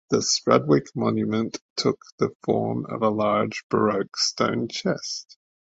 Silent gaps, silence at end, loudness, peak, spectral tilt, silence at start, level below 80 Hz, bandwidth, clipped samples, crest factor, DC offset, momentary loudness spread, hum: 1.61-1.76 s, 2.12-2.18 s, 2.35-2.40 s, 3.63-3.70 s; 0.45 s; -24 LUFS; -2 dBFS; -4.5 dB/octave; 0.1 s; -60 dBFS; 8 kHz; under 0.1%; 22 dB; under 0.1%; 8 LU; none